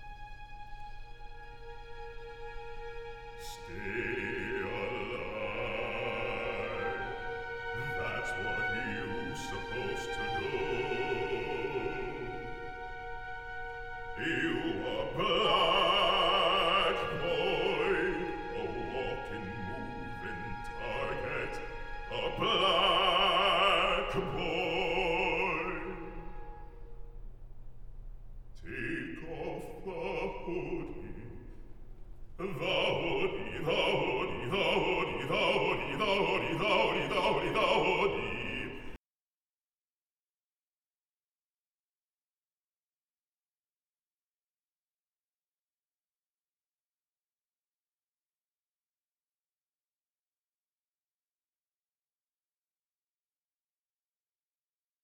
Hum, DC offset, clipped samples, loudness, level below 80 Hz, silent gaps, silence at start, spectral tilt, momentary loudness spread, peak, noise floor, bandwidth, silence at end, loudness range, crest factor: none; under 0.1%; under 0.1%; -32 LUFS; -50 dBFS; none; 0 s; -4.5 dB/octave; 20 LU; -14 dBFS; under -90 dBFS; 15.5 kHz; 16.1 s; 13 LU; 20 dB